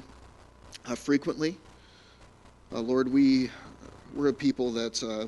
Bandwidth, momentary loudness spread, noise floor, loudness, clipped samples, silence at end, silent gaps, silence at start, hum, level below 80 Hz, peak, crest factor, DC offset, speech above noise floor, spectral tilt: 11.5 kHz; 24 LU; -55 dBFS; -28 LUFS; under 0.1%; 0 s; none; 0 s; none; -58 dBFS; -12 dBFS; 16 dB; under 0.1%; 28 dB; -5 dB/octave